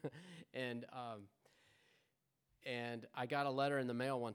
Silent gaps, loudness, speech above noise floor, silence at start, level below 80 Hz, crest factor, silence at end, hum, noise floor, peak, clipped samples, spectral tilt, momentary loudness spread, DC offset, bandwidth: none; -43 LUFS; 42 dB; 0.05 s; under -90 dBFS; 20 dB; 0 s; none; -84 dBFS; -24 dBFS; under 0.1%; -6 dB/octave; 14 LU; under 0.1%; 19.5 kHz